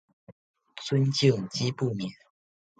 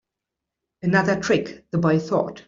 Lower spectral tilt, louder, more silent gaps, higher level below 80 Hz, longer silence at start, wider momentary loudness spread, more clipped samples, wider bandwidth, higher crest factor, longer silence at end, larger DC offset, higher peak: about the same, -6 dB/octave vs -6.5 dB/octave; second, -27 LUFS vs -22 LUFS; first, 0.32-0.54 s vs none; second, -66 dBFS vs -58 dBFS; second, 0.3 s vs 0.85 s; first, 16 LU vs 6 LU; neither; first, 9 kHz vs 7.6 kHz; about the same, 20 dB vs 20 dB; first, 0.65 s vs 0.05 s; neither; second, -10 dBFS vs -4 dBFS